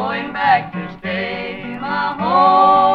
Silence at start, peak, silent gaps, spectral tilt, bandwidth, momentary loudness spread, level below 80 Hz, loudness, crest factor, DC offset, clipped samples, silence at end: 0 s; -2 dBFS; none; -7 dB/octave; 5.6 kHz; 15 LU; -50 dBFS; -16 LUFS; 14 dB; under 0.1%; under 0.1%; 0 s